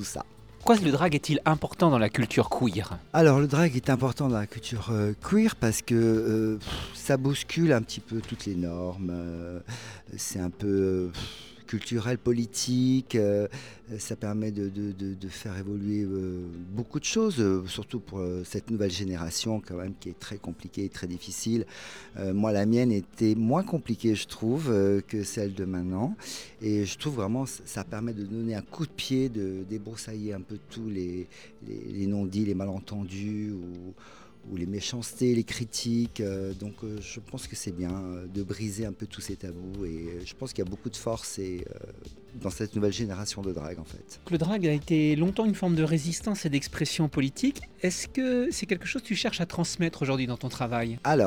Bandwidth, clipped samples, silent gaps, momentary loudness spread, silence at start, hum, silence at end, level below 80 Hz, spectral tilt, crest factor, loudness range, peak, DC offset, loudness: over 20 kHz; under 0.1%; none; 14 LU; 0 s; none; 0 s; -52 dBFS; -5.5 dB/octave; 22 dB; 9 LU; -6 dBFS; 0.2%; -29 LUFS